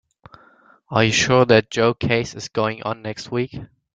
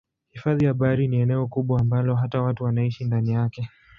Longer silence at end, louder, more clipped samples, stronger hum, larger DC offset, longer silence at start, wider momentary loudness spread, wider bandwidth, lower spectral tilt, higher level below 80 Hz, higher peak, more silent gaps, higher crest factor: about the same, 0.35 s vs 0.3 s; first, -19 LUFS vs -23 LUFS; neither; neither; neither; first, 0.9 s vs 0.35 s; first, 13 LU vs 4 LU; first, 9.4 kHz vs 5.6 kHz; second, -4.5 dB/octave vs -10.5 dB/octave; about the same, -52 dBFS vs -50 dBFS; first, -2 dBFS vs -8 dBFS; neither; about the same, 20 dB vs 16 dB